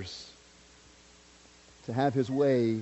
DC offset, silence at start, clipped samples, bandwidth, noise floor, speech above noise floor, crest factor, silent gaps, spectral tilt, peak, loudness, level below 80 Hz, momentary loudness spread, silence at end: under 0.1%; 0 s; under 0.1%; 8.2 kHz; -57 dBFS; 29 dB; 18 dB; none; -7 dB/octave; -14 dBFS; -29 LUFS; -66 dBFS; 20 LU; 0 s